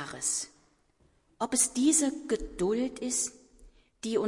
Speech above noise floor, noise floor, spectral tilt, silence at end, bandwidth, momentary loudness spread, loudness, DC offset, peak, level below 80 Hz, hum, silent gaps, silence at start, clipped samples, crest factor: 38 dB; -67 dBFS; -2.5 dB/octave; 0 s; 11.5 kHz; 11 LU; -29 LUFS; under 0.1%; -10 dBFS; -54 dBFS; none; none; 0 s; under 0.1%; 22 dB